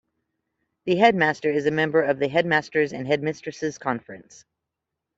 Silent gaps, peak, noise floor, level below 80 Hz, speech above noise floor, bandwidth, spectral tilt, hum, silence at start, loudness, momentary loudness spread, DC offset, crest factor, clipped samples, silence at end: none; -4 dBFS; -84 dBFS; -66 dBFS; 61 dB; 7.8 kHz; -5.5 dB/octave; none; 0.85 s; -23 LUFS; 12 LU; under 0.1%; 20 dB; under 0.1%; 0.95 s